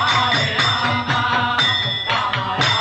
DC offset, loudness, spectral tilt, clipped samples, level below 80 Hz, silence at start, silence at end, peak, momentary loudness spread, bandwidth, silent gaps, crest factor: under 0.1%; -17 LUFS; -3.5 dB/octave; under 0.1%; -50 dBFS; 0 s; 0 s; -6 dBFS; 3 LU; 9 kHz; none; 14 dB